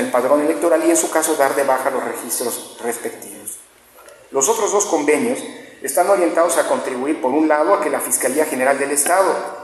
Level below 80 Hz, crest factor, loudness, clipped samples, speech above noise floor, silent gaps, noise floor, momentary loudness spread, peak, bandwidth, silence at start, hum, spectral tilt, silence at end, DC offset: -68 dBFS; 16 dB; -17 LUFS; under 0.1%; 28 dB; none; -45 dBFS; 11 LU; -2 dBFS; 14 kHz; 0 s; none; -2 dB/octave; 0 s; under 0.1%